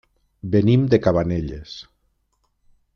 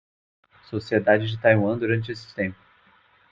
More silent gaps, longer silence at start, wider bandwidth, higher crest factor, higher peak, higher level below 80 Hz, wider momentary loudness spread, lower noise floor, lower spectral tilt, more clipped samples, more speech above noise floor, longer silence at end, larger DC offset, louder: neither; second, 0.45 s vs 0.7 s; second, 6.6 kHz vs 7.6 kHz; about the same, 18 dB vs 20 dB; about the same, -4 dBFS vs -4 dBFS; first, -44 dBFS vs -62 dBFS; first, 20 LU vs 14 LU; first, -69 dBFS vs -59 dBFS; about the same, -8.5 dB/octave vs -8 dB/octave; neither; first, 50 dB vs 36 dB; first, 1.15 s vs 0.8 s; neither; first, -19 LUFS vs -23 LUFS